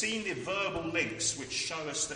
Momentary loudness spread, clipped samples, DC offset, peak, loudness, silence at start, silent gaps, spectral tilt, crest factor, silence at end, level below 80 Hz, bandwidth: 3 LU; under 0.1%; under 0.1%; -16 dBFS; -32 LUFS; 0 s; none; -2 dB/octave; 18 dB; 0 s; -60 dBFS; 10 kHz